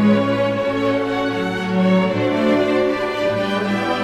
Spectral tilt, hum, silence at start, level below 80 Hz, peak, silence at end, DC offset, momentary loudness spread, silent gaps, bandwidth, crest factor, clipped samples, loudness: -7 dB/octave; none; 0 s; -50 dBFS; -4 dBFS; 0 s; under 0.1%; 4 LU; none; 12.5 kHz; 14 dB; under 0.1%; -18 LUFS